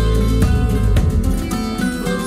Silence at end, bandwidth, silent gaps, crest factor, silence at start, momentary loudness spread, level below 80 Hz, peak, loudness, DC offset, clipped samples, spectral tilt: 0 s; 15.5 kHz; none; 12 dB; 0 s; 5 LU; -18 dBFS; -4 dBFS; -18 LUFS; under 0.1%; under 0.1%; -6.5 dB/octave